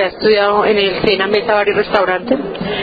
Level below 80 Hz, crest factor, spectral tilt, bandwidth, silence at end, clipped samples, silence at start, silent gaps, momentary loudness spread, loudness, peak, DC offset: -44 dBFS; 14 dB; -7 dB/octave; 5 kHz; 0 s; under 0.1%; 0 s; none; 6 LU; -14 LUFS; 0 dBFS; under 0.1%